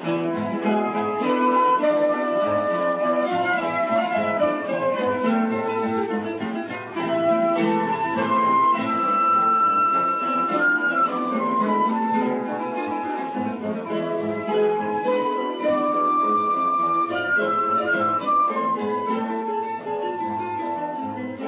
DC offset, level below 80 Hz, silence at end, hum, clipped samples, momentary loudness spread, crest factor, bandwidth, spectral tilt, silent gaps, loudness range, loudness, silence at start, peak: under 0.1%; -66 dBFS; 0 s; none; under 0.1%; 8 LU; 12 dB; 4 kHz; -9.5 dB/octave; none; 5 LU; -22 LUFS; 0 s; -10 dBFS